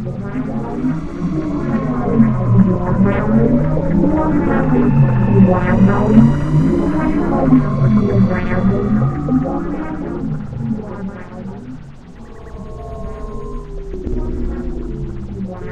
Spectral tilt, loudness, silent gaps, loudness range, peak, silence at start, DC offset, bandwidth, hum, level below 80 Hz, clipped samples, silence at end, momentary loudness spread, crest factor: -10 dB/octave; -16 LUFS; none; 15 LU; 0 dBFS; 0 s; under 0.1%; 7.6 kHz; none; -28 dBFS; under 0.1%; 0 s; 17 LU; 16 dB